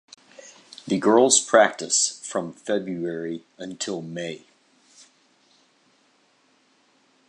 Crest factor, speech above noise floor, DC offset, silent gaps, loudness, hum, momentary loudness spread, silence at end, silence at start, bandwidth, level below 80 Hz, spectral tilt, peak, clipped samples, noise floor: 22 dB; 41 dB; under 0.1%; none; -22 LUFS; none; 20 LU; 2.9 s; 0.45 s; 11.5 kHz; -74 dBFS; -2.5 dB/octave; -2 dBFS; under 0.1%; -63 dBFS